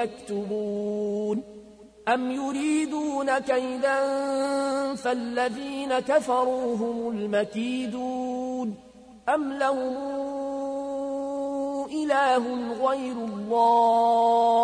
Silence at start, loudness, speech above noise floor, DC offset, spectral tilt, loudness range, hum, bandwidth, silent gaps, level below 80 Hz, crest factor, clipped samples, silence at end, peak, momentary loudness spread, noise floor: 0 s; -26 LUFS; 24 dB; under 0.1%; -4.5 dB/octave; 5 LU; none; 10.5 kHz; none; -64 dBFS; 16 dB; under 0.1%; 0 s; -10 dBFS; 10 LU; -49 dBFS